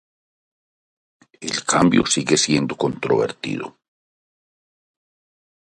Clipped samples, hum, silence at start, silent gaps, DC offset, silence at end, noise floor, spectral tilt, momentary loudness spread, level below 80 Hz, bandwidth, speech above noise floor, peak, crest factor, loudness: under 0.1%; none; 1.4 s; none; under 0.1%; 2.1 s; under -90 dBFS; -4 dB/octave; 13 LU; -54 dBFS; 11.5 kHz; over 71 dB; -2 dBFS; 22 dB; -19 LUFS